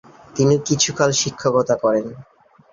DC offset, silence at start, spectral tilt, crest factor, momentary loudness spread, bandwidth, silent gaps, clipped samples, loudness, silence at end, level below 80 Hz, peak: under 0.1%; 0.35 s; -4 dB/octave; 18 dB; 7 LU; 7.8 kHz; none; under 0.1%; -18 LUFS; 0.5 s; -54 dBFS; -2 dBFS